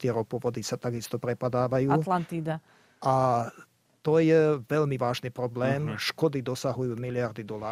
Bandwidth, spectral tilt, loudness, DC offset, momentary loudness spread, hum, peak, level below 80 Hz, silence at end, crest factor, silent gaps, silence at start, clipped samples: 15.5 kHz; -6.5 dB/octave; -28 LUFS; under 0.1%; 9 LU; none; -10 dBFS; -64 dBFS; 0 s; 16 dB; none; 0 s; under 0.1%